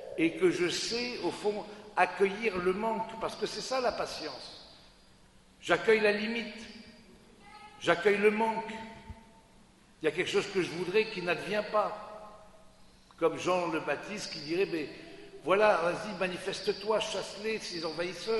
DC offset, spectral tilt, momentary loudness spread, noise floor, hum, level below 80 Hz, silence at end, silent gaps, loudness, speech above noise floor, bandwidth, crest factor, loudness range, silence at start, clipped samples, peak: under 0.1%; -4 dB/octave; 18 LU; -59 dBFS; none; -62 dBFS; 0 s; none; -31 LUFS; 29 dB; 11.5 kHz; 24 dB; 3 LU; 0 s; under 0.1%; -8 dBFS